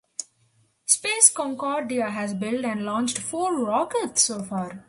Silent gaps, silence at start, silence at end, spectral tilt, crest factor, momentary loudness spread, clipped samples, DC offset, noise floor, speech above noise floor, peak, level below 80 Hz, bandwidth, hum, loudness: none; 0.2 s; 0.05 s; -2 dB/octave; 26 dB; 13 LU; under 0.1%; under 0.1%; -65 dBFS; 40 dB; 0 dBFS; -68 dBFS; 11.5 kHz; none; -23 LUFS